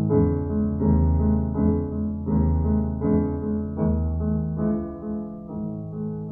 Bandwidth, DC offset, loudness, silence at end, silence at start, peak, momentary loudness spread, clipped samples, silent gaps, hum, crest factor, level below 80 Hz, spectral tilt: 2.2 kHz; under 0.1%; -24 LUFS; 0 s; 0 s; -8 dBFS; 10 LU; under 0.1%; none; none; 16 dB; -32 dBFS; -15 dB/octave